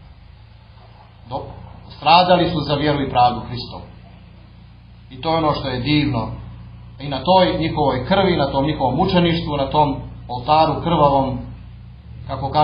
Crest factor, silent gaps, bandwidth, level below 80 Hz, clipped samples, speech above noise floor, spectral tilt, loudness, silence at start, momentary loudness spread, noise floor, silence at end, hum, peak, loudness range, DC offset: 20 dB; none; 5.2 kHz; -38 dBFS; under 0.1%; 26 dB; -9.5 dB/octave; -18 LUFS; 0.1 s; 21 LU; -43 dBFS; 0 s; none; 0 dBFS; 5 LU; under 0.1%